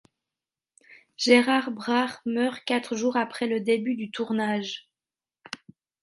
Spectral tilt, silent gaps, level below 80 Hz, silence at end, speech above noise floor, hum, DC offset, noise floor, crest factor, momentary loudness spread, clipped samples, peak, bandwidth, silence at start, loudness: -4 dB/octave; none; -76 dBFS; 1.25 s; over 65 dB; none; under 0.1%; under -90 dBFS; 22 dB; 19 LU; under 0.1%; -4 dBFS; 11.5 kHz; 0.9 s; -25 LUFS